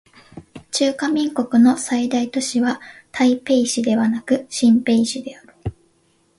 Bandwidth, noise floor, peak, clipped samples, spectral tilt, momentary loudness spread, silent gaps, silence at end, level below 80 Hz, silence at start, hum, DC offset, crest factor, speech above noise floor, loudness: 11.5 kHz; -61 dBFS; -4 dBFS; under 0.1%; -4 dB/octave; 17 LU; none; 0.7 s; -52 dBFS; 0.35 s; none; under 0.1%; 16 dB; 43 dB; -18 LUFS